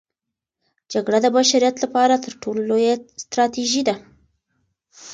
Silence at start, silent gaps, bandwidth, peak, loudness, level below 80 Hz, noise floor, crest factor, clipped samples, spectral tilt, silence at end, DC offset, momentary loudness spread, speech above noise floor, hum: 0.9 s; none; 9.4 kHz; -4 dBFS; -19 LUFS; -64 dBFS; -84 dBFS; 18 dB; under 0.1%; -2.5 dB/octave; 0 s; under 0.1%; 11 LU; 65 dB; none